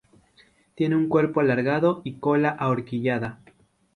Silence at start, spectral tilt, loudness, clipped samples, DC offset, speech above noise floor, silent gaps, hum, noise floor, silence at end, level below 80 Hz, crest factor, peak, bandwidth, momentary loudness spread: 0.8 s; -9 dB/octave; -23 LUFS; under 0.1%; under 0.1%; 36 dB; none; none; -59 dBFS; 0.6 s; -62 dBFS; 18 dB; -8 dBFS; 10 kHz; 7 LU